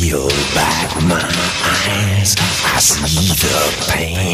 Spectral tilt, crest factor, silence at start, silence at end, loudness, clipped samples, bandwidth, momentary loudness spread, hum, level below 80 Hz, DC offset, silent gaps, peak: -3 dB/octave; 14 dB; 0 s; 0 s; -14 LUFS; under 0.1%; 15.5 kHz; 4 LU; none; -30 dBFS; under 0.1%; none; -2 dBFS